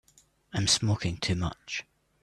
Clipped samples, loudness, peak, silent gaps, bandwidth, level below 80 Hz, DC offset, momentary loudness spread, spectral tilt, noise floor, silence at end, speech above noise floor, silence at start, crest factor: under 0.1%; -29 LUFS; -10 dBFS; none; 12.5 kHz; -52 dBFS; under 0.1%; 12 LU; -3.5 dB/octave; -63 dBFS; 0.4 s; 34 dB; 0.55 s; 20 dB